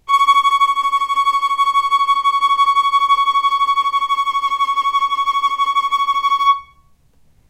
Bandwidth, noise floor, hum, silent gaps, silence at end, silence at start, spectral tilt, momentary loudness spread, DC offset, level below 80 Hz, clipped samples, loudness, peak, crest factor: 15.5 kHz; -52 dBFS; none; none; 0.85 s; 0.1 s; 1.5 dB/octave; 4 LU; under 0.1%; -56 dBFS; under 0.1%; -15 LUFS; -2 dBFS; 12 dB